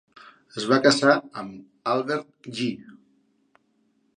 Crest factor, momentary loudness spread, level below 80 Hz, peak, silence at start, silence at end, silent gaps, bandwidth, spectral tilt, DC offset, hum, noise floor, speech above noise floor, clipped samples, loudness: 24 dB; 20 LU; -72 dBFS; -2 dBFS; 0.55 s; 1.25 s; none; 10.5 kHz; -4 dB/octave; under 0.1%; none; -68 dBFS; 44 dB; under 0.1%; -23 LUFS